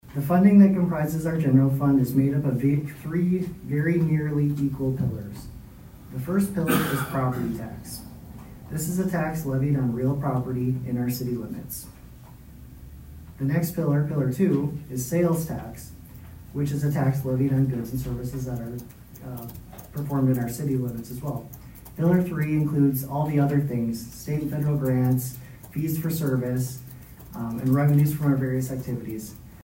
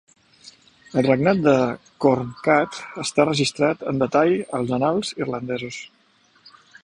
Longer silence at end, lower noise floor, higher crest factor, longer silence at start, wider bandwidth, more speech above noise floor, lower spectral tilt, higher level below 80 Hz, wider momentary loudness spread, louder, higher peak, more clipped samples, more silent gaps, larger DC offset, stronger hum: second, 0 s vs 1 s; second, -45 dBFS vs -59 dBFS; about the same, 18 dB vs 20 dB; second, 0.05 s vs 0.45 s; first, 16.5 kHz vs 11 kHz; second, 21 dB vs 38 dB; first, -7.5 dB/octave vs -5.5 dB/octave; first, -48 dBFS vs -58 dBFS; first, 20 LU vs 10 LU; second, -25 LUFS vs -21 LUFS; second, -6 dBFS vs -2 dBFS; neither; neither; neither; neither